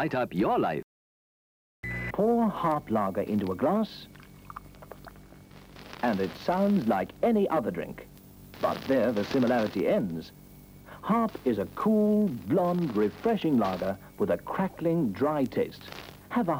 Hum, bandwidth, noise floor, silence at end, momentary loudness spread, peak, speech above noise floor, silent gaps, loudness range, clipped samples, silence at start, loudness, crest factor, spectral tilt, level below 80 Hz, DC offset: none; 17 kHz; -50 dBFS; 0 s; 20 LU; -14 dBFS; 23 dB; 0.83-1.83 s; 4 LU; under 0.1%; 0 s; -28 LUFS; 14 dB; -7.5 dB/octave; -56 dBFS; under 0.1%